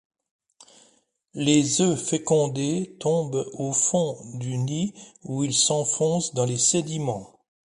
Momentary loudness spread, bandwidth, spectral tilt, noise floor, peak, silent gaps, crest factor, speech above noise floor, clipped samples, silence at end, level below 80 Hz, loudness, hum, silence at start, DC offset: 11 LU; 11.5 kHz; -4 dB/octave; -64 dBFS; -6 dBFS; none; 20 dB; 40 dB; under 0.1%; 0.45 s; -64 dBFS; -24 LUFS; none; 1.35 s; under 0.1%